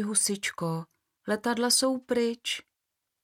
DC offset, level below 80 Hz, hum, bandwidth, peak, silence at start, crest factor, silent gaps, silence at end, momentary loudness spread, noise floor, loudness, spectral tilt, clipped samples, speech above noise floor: under 0.1%; -72 dBFS; none; 18 kHz; -12 dBFS; 0 s; 18 dB; none; 0.65 s; 11 LU; -84 dBFS; -28 LUFS; -2.5 dB/octave; under 0.1%; 56 dB